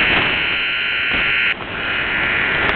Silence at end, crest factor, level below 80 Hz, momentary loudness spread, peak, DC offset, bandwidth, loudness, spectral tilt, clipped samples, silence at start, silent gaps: 0 s; 18 dB; -38 dBFS; 4 LU; 0 dBFS; under 0.1%; 5.4 kHz; -16 LUFS; -6 dB/octave; under 0.1%; 0 s; none